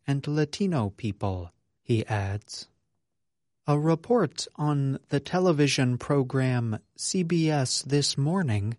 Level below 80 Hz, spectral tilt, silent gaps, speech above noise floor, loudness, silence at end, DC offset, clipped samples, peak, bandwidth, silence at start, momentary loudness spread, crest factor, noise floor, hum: -60 dBFS; -5.5 dB/octave; none; 60 dB; -27 LUFS; 0.05 s; under 0.1%; under 0.1%; -10 dBFS; 11.5 kHz; 0.05 s; 9 LU; 16 dB; -86 dBFS; none